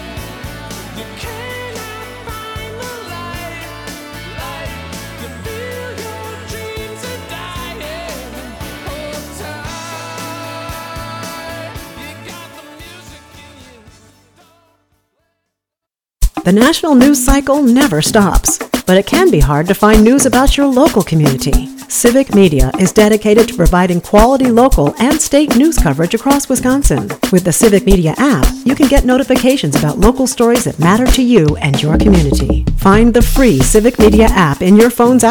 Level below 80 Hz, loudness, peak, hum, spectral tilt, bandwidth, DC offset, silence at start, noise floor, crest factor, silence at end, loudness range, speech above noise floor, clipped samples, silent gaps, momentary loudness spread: -22 dBFS; -10 LUFS; 0 dBFS; none; -5 dB/octave; 19.5 kHz; under 0.1%; 0 s; -84 dBFS; 12 dB; 0 s; 16 LU; 75 dB; under 0.1%; none; 18 LU